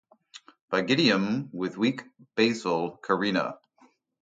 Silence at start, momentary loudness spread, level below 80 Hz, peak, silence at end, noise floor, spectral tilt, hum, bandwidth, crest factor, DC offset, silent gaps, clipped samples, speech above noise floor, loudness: 0.35 s; 11 LU; -70 dBFS; -8 dBFS; 0.65 s; -63 dBFS; -5 dB/octave; none; 9.2 kHz; 20 dB; under 0.1%; 0.61-0.68 s; under 0.1%; 36 dB; -27 LUFS